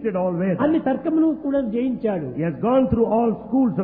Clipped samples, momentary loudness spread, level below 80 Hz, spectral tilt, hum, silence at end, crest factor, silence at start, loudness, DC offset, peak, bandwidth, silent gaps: under 0.1%; 5 LU; -46 dBFS; -12.5 dB/octave; none; 0 s; 14 dB; 0 s; -21 LUFS; under 0.1%; -6 dBFS; 3.8 kHz; none